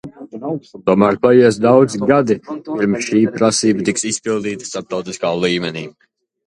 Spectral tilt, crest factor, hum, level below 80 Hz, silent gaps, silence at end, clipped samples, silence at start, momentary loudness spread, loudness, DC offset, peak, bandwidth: -5 dB/octave; 16 dB; none; -54 dBFS; none; 0.55 s; under 0.1%; 0.05 s; 14 LU; -16 LUFS; under 0.1%; 0 dBFS; 11.5 kHz